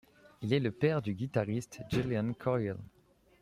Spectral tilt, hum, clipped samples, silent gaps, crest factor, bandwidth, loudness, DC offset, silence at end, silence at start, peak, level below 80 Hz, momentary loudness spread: -7 dB/octave; none; under 0.1%; none; 18 dB; 15.5 kHz; -34 LUFS; under 0.1%; 0.55 s; 0.4 s; -14 dBFS; -62 dBFS; 8 LU